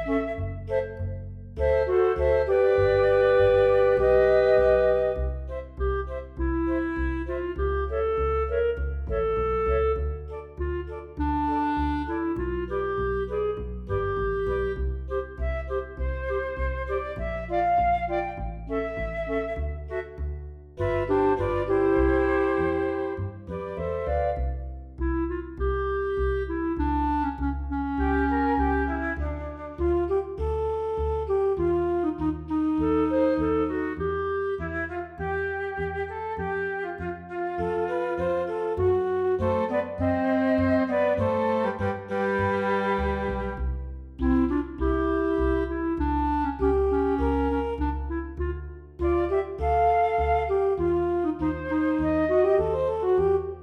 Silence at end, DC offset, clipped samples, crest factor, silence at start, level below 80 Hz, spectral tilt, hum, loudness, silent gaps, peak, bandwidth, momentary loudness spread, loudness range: 0 s; under 0.1%; under 0.1%; 16 dB; 0 s; -36 dBFS; -9 dB/octave; none; -26 LUFS; none; -10 dBFS; 6 kHz; 11 LU; 7 LU